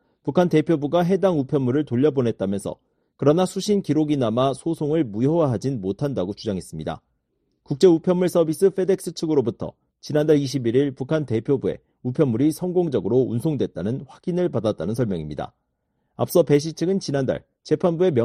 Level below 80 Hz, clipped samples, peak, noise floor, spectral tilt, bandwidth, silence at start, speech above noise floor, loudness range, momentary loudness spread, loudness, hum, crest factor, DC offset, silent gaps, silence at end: -56 dBFS; under 0.1%; -4 dBFS; -73 dBFS; -7 dB/octave; 13.5 kHz; 0.25 s; 52 dB; 3 LU; 10 LU; -22 LUFS; none; 18 dB; under 0.1%; none; 0 s